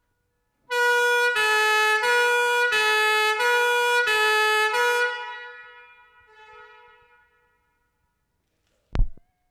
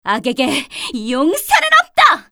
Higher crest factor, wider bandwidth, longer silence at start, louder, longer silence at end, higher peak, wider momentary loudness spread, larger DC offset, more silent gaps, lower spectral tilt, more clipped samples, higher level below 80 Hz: about the same, 16 dB vs 14 dB; second, 17 kHz vs 20 kHz; first, 0.7 s vs 0.05 s; second, -20 LUFS vs -14 LUFS; first, 0.35 s vs 0.1 s; second, -8 dBFS vs 0 dBFS; first, 13 LU vs 10 LU; neither; neither; about the same, -1 dB/octave vs -2 dB/octave; neither; first, -38 dBFS vs -52 dBFS